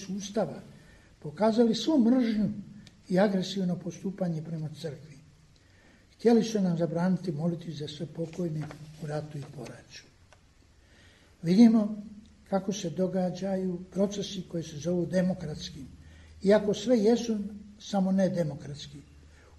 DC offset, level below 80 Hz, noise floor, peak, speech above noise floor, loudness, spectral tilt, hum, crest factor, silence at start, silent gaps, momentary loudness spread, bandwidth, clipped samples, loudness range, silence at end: under 0.1%; -60 dBFS; -60 dBFS; -10 dBFS; 32 dB; -28 LUFS; -6.5 dB/octave; none; 20 dB; 0 s; none; 18 LU; 12 kHz; under 0.1%; 7 LU; 0.6 s